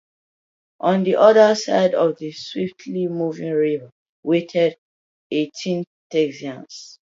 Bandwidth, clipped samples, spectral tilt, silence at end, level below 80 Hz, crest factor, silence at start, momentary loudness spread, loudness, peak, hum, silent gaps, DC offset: 7.8 kHz; under 0.1%; -5.5 dB/octave; 0.25 s; -72 dBFS; 20 dB; 0.85 s; 16 LU; -20 LUFS; 0 dBFS; none; 3.92-4.23 s, 4.78-5.30 s, 5.87-6.10 s; under 0.1%